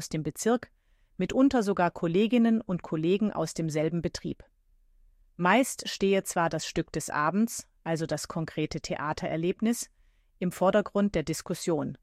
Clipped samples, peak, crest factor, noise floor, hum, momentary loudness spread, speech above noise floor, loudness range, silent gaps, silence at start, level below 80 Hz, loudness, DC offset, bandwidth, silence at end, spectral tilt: under 0.1%; -10 dBFS; 18 dB; -63 dBFS; none; 10 LU; 35 dB; 4 LU; none; 0 s; -56 dBFS; -28 LUFS; under 0.1%; 15.5 kHz; 0.05 s; -5 dB/octave